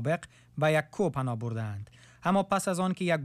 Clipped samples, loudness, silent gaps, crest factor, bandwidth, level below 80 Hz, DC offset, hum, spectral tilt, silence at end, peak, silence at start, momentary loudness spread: under 0.1%; -30 LUFS; none; 14 dB; 14.5 kHz; -64 dBFS; under 0.1%; none; -6 dB/octave; 0 s; -16 dBFS; 0 s; 12 LU